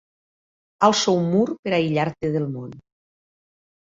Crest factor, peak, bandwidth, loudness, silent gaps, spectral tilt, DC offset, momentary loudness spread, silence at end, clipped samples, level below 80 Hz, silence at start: 22 dB; -2 dBFS; 7.8 kHz; -21 LUFS; 1.59-1.63 s; -5 dB/octave; under 0.1%; 11 LU; 1.15 s; under 0.1%; -60 dBFS; 0.8 s